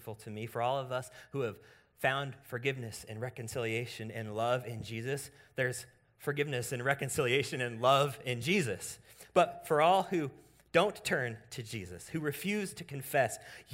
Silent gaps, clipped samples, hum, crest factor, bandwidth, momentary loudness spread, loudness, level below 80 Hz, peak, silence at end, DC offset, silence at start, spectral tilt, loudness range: none; under 0.1%; none; 22 dB; 16 kHz; 13 LU; -34 LUFS; -68 dBFS; -12 dBFS; 0 s; under 0.1%; 0 s; -4.5 dB/octave; 6 LU